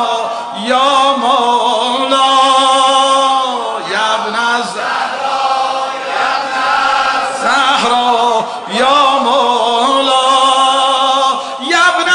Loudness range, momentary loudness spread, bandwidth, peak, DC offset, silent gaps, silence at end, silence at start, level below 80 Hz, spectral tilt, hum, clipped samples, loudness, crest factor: 4 LU; 7 LU; 11 kHz; 0 dBFS; under 0.1%; none; 0 s; 0 s; -58 dBFS; -1 dB/octave; none; under 0.1%; -11 LUFS; 12 dB